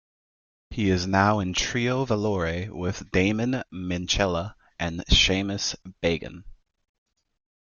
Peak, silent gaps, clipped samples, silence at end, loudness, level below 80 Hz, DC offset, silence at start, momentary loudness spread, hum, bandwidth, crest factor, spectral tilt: -6 dBFS; none; under 0.1%; 1.1 s; -25 LUFS; -38 dBFS; under 0.1%; 0.7 s; 10 LU; none; 7.4 kHz; 20 dB; -4.5 dB/octave